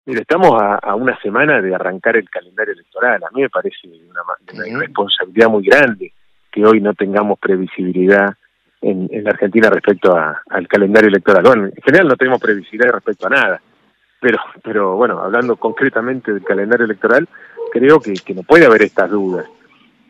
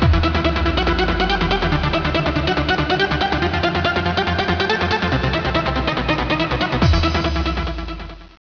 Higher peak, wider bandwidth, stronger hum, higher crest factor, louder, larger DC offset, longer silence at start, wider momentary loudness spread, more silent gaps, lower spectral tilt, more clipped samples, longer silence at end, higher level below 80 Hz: about the same, 0 dBFS vs -2 dBFS; first, 10.5 kHz vs 5.4 kHz; neither; about the same, 14 dB vs 16 dB; first, -13 LUFS vs -18 LUFS; second, under 0.1% vs 0.1%; about the same, 0.05 s vs 0 s; first, 12 LU vs 3 LU; neither; about the same, -6.5 dB/octave vs -6 dB/octave; first, 0.1% vs under 0.1%; first, 0.65 s vs 0.15 s; second, -56 dBFS vs -26 dBFS